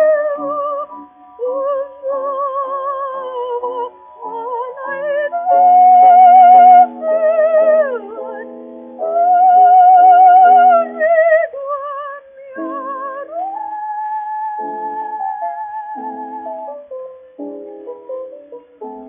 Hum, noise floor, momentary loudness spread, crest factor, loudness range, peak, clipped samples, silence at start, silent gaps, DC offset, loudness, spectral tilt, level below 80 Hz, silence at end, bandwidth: none; -36 dBFS; 23 LU; 14 dB; 16 LU; 0 dBFS; under 0.1%; 0 s; none; under 0.1%; -12 LUFS; -1 dB/octave; -70 dBFS; 0 s; 3.4 kHz